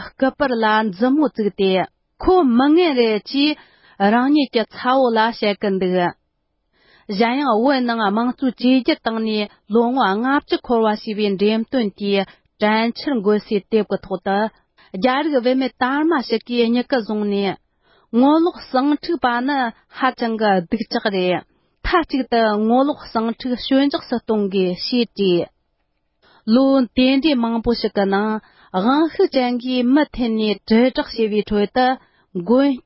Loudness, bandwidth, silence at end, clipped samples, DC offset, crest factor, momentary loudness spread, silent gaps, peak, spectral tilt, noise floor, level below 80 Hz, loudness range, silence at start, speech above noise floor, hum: -18 LUFS; 5.8 kHz; 0.05 s; under 0.1%; under 0.1%; 14 dB; 7 LU; none; -4 dBFS; -10 dB/octave; -70 dBFS; -46 dBFS; 3 LU; 0 s; 52 dB; none